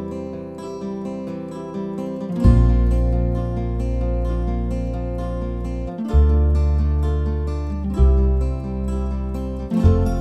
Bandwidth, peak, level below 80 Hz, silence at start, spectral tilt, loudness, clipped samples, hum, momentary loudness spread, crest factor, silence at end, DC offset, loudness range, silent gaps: 8.4 kHz; -2 dBFS; -22 dBFS; 0 s; -9.5 dB/octave; -22 LUFS; under 0.1%; none; 12 LU; 18 dB; 0 s; 0.1%; 3 LU; none